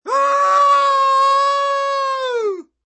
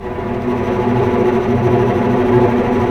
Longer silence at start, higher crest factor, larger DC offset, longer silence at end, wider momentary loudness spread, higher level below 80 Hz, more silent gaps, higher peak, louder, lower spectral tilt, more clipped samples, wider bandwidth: about the same, 0.05 s vs 0 s; about the same, 12 dB vs 14 dB; second, under 0.1% vs 0.4%; first, 0.25 s vs 0 s; about the same, 8 LU vs 6 LU; second, -88 dBFS vs -34 dBFS; neither; second, -4 dBFS vs 0 dBFS; about the same, -15 LUFS vs -15 LUFS; second, 1 dB/octave vs -8.5 dB/octave; neither; about the same, 8.8 kHz vs 8.4 kHz